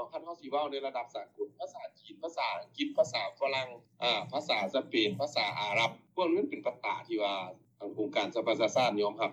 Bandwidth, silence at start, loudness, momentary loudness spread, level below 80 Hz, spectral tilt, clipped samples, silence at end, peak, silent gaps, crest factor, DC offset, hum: 11.5 kHz; 0 s; -33 LUFS; 13 LU; -88 dBFS; -4 dB/octave; under 0.1%; 0 s; -16 dBFS; none; 18 dB; under 0.1%; none